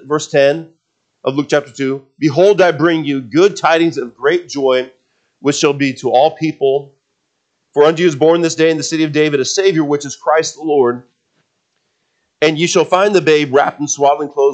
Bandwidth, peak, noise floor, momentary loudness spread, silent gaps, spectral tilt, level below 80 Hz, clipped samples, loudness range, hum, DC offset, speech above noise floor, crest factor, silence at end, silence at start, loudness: 9 kHz; 0 dBFS; -67 dBFS; 7 LU; none; -4.5 dB/octave; -66 dBFS; under 0.1%; 3 LU; none; under 0.1%; 54 dB; 14 dB; 0 s; 0.05 s; -14 LUFS